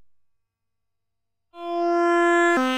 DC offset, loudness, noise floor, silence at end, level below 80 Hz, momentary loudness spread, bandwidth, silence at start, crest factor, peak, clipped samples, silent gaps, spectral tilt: under 0.1%; -20 LUFS; -85 dBFS; 0 s; -74 dBFS; 12 LU; 11 kHz; 1.55 s; 16 dB; -8 dBFS; under 0.1%; none; -2.5 dB/octave